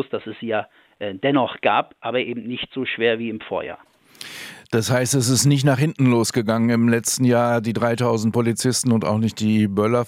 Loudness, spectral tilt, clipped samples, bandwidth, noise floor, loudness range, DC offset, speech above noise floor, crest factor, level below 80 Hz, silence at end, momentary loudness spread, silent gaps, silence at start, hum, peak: -20 LUFS; -5 dB/octave; under 0.1%; 16.5 kHz; -40 dBFS; 6 LU; under 0.1%; 20 dB; 18 dB; -64 dBFS; 0 s; 11 LU; none; 0 s; none; -2 dBFS